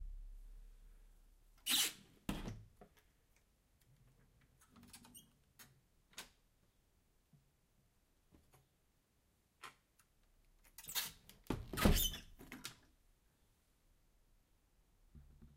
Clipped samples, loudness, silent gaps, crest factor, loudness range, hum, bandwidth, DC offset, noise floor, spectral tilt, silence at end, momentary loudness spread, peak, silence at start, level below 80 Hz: under 0.1%; -40 LUFS; none; 32 dB; 22 LU; none; 16 kHz; under 0.1%; -78 dBFS; -3 dB/octave; 0.1 s; 27 LU; -16 dBFS; 0 s; -52 dBFS